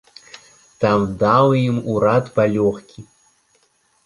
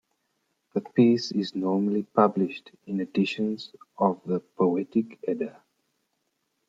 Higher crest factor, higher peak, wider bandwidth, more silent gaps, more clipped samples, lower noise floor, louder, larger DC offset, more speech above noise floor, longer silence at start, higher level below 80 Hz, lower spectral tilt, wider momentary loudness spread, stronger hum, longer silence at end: about the same, 18 dB vs 22 dB; first, -2 dBFS vs -6 dBFS; first, 11.5 kHz vs 7.8 kHz; neither; neither; second, -61 dBFS vs -77 dBFS; first, -17 LUFS vs -26 LUFS; neither; second, 44 dB vs 51 dB; about the same, 0.8 s vs 0.75 s; first, -50 dBFS vs -74 dBFS; about the same, -7.5 dB/octave vs -7 dB/octave; second, 7 LU vs 12 LU; neither; second, 1.05 s vs 1.2 s